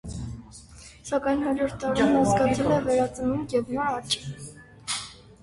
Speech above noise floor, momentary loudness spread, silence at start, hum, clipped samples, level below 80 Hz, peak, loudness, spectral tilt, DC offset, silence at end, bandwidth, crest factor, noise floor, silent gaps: 23 dB; 21 LU; 0.05 s; none; under 0.1%; -48 dBFS; -10 dBFS; -25 LUFS; -5 dB/octave; under 0.1%; 0.25 s; 11.5 kHz; 16 dB; -47 dBFS; none